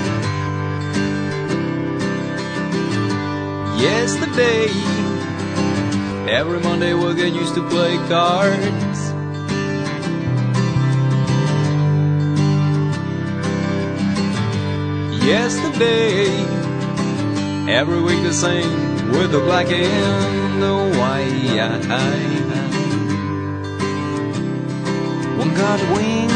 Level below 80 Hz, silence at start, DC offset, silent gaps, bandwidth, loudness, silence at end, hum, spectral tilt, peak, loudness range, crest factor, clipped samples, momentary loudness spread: -50 dBFS; 0 s; under 0.1%; none; 9.6 kHz; -19 LUFS; 0 s; none; -5.5 dB/octave; 0 dBFS; 3 LU; 18 dB; under 0.1%; 6 LU